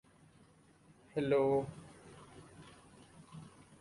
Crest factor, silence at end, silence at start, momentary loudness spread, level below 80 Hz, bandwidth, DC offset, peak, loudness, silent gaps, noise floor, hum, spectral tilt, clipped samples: 18 dB; 0.35 s; 1.15 s; 27 LU; -70 dBFS; 11.5 kHz; under 0.1%; -20 dBFS; -34 LUFS; none; -65 dBFS; none; -7 dB/octave; under 0.1%